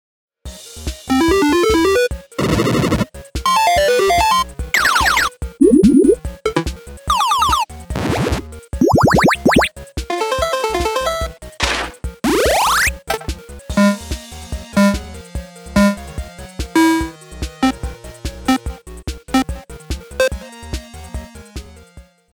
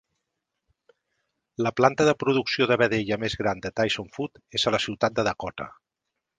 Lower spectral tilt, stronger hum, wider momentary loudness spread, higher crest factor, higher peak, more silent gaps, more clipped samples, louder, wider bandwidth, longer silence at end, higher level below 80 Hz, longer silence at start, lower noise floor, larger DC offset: about the same, -4.5 dB/octave vs -4.5 dB/octave; neither; first, 18 LU vs 13 LU; second, 18 dB vs 24 dB; about the same, 0 dBFS vs -2 dBFS; neither; neither; first, -16 LUFS vs -25 LUFS; first, over 20 kHz vs 9.8 kHz; second, 0.3 s vs 0.7 s; first, -30 dBFS vs -56 dBFS; second, 0.45 s vs 1.6 s; second, -44 dBFS vs -83 dBFS; first, 0.2% vs under 0.1%